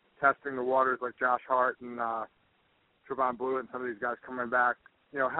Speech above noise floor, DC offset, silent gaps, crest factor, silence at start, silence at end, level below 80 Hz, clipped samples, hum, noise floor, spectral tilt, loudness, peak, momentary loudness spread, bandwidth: 40 dB; under 0.1%; none; 20 dB; 0.2 s; 0 s; -74 dBFS; under 0.1%; none; -70 dBFS; -3.5 dB/octave; -31 LUFS; -10 dBFS; 10 LU; 4 kHz